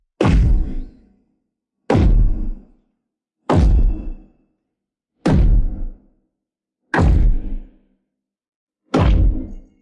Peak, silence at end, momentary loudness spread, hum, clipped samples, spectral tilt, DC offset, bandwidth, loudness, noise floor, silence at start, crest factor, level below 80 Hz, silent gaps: -2 dBFS; 0.2 s; 19 LU; none; under 0.1%; -8 dB/octave; under 0.1%; 8 kHz; -18 LUFS; -82 dBFS; 0.2 s; 16 dB; -20 dBFS; 8.56-8.67 s